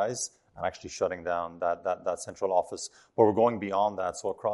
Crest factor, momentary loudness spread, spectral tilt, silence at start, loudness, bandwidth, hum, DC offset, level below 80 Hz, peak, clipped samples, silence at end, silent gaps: 22 dB; 11 LU; -4.5 dB/octave; 0 s; -29 LUFS; 11.5 kHz; none; under 0.1%; -68 dBFS; -8 dBFS; under 0.1%; 0 s; none